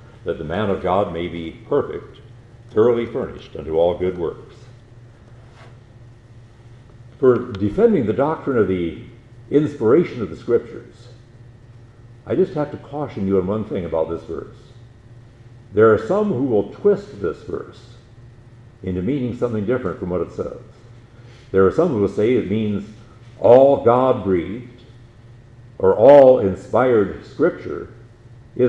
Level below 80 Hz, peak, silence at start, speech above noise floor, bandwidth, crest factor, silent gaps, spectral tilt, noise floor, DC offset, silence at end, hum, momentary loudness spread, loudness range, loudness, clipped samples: -48 dBFS; 0 dBFS; 0.25 s; 26 dB; 8.2 kHz; 20 dB; none; -8.5 dB/octave; -44 dBFS; under 0.1%; 0 s; none; 17 LU; 10 LU; -18 LUFS; under 0.1%